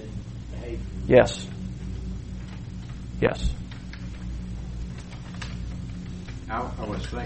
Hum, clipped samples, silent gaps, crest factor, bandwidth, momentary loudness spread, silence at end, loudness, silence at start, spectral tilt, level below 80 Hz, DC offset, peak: 60 Hz at -45 dBFS; under 0.1%; none; 26 dB; 8.4 kHz; 16 LU; 0 s; -29 LUFS; 0 s; -6.5 dB/octave; -36 dBFS; 0.1%; -2 dBFS